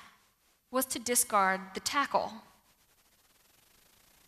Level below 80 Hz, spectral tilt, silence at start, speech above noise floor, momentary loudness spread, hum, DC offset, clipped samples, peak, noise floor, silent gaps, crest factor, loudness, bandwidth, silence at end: -70 dBFS; -1.5 dB/octave; 0 s; 39 dB; 10 LU; none; under 0.1%; under 0.1%; -14 dBFS; -70 dBFS; none; 20 dB; -30 LUFS; 15 kHz; 1.85 s